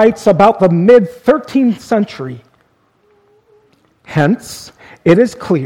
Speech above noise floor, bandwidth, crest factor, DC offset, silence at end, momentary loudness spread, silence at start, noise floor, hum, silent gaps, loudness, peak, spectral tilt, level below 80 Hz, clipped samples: 44 dB; 15.5 kHz; 14 dB; under 0.1%; 0 s; 18 LU; 0 s; -56 dBFS; none; none; -12 LUFS; 0 dBFS; -7 dB/octave; -48 dBFS; 0.3%